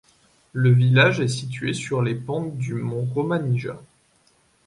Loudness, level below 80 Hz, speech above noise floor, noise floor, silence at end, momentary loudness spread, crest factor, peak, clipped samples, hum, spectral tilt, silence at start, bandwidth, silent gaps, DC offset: -22 LUFS; -60 dBFS; 40 dB; -61 dBFS; 0.85 s; 12 LU; 20 dB; -2 dBFS; under 0.1%; none; -6.5 dB/octave; 0.55 s; 11 kHz; none; under 0.1%